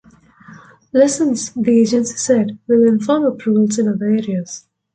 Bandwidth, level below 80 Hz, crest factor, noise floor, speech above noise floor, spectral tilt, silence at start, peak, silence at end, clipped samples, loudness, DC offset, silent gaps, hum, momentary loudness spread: 9.4 kHz; -60 dBFS; 14 dB; -45 dBFS; 29 dB; -5.5 dB/octave; 0.5 s; -2 dBFS; 0.35 s; under 0.1%; -16 LUFS; under 0.1%; none; none; 7 LU